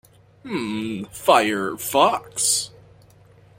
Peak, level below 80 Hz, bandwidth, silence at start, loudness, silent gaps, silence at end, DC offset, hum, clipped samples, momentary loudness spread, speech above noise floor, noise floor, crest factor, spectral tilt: -2 dBFS; -60 dBFS; 16.5 kHz; 0.45 s; -21 LUFS; none; 0.9 s; under 0.1%; none; under 0.1%; 12 LU; 30 dB; -51 dBFS; 22 dB; -2.5 dB/octave